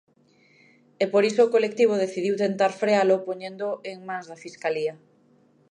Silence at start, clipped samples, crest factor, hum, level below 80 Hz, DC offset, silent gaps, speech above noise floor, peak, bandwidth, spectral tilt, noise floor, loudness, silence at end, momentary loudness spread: 1 s; under 0.1%; 18 dB; none; -78 dBFS; under 0.1%; none; 37 dB; -6 dBFS; 10.5 kHz; -5 dB/octave; -60 dBFS; -24 LUFS; 0.75 s; 14 LU